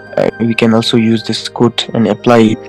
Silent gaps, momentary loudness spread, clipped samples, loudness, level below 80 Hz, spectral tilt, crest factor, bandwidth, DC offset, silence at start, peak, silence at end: none; 6 LU; 2%; -12 LUFS; -48 dBFS; -6 dB/octave; 12 dB; 12 kHz; under 0.1%; 0 s; 0 dBFS; 0 s